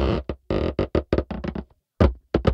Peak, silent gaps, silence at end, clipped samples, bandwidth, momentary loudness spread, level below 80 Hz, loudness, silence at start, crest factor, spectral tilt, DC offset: -4 dBFS; none; 0 s; under 0.1%; 6.8 kHz; 9 LU; -30 dBFS; -25 LUFS; 0 s; 20 dB; -9 dB/octave; under 0.1%